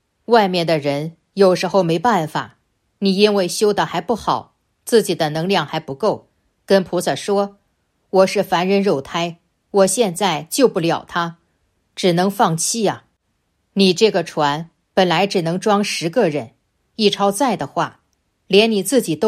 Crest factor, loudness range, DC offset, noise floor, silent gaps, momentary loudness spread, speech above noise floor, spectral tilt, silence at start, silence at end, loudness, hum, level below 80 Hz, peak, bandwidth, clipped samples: 18 dB; 2 LU; under 0.1%; -68 dBFS; none; 10 LU; 51 dB; -4.5 dB/octave; 0.3 s; 0 s; -18 LUFS; none; -60 dBFS; 0 dBFS; 15.5 kHz; under 0.1%